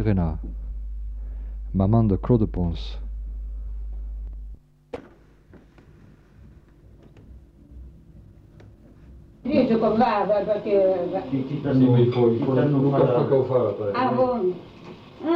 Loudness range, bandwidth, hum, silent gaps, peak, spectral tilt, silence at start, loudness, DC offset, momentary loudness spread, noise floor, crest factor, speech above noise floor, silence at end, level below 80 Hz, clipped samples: 19 LU; 5.8 kHz; none; none; -6 dBFS; -10 dB/octave; 0 s; -22 LUFS; under 0.1%; 18 LU; -51 dBFS; 18 dB; 30 dB; 0 s; -36 dBFS; under 0.1%